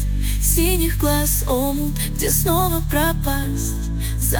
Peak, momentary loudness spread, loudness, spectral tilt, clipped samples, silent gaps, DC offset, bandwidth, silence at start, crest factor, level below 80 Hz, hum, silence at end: -4 dBFS; 6 LU; -20 LUFS; -4.5 dB/octave; under 0.1%; none; under 0.1%; 19.5 kHz; 0 s; 16 dB; -24 dBFS; none; 0 s